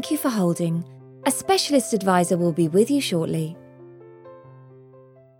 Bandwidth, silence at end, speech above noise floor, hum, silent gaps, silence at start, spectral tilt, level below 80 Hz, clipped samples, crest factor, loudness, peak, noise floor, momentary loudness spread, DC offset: 18 kHz; 0.8 s; 29 dB; none; none; 0 s; -5 dB/octave; -66 dBFS; under 0.1%; 18 dB; -22 LUFS; -6 dBFS; -50 dBFS; 10 LU; under 0.1%